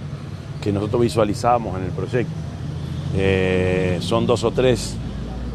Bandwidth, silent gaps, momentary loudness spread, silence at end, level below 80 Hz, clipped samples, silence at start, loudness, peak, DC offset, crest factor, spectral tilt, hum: 13 kHz; none; 11 LU; 0 s; -38 dBFS; under 0.1%; 0 s; -21 LUFS; -2 dBFS; under 0.1%; 18 dB; -6.5 dB/octave; none